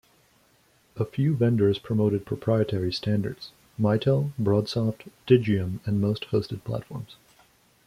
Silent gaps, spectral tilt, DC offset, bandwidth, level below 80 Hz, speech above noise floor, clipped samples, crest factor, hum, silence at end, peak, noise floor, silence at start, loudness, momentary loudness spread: none; -8 dB/octave; under 0.1%; 14.5 kHz; -58 dBFS; 38 dB; under 0.1%; 20 dB; none; 0.75 s; -4 dBFS; -62 dBFS; 0.95 s; -26 LUFS; 12 LU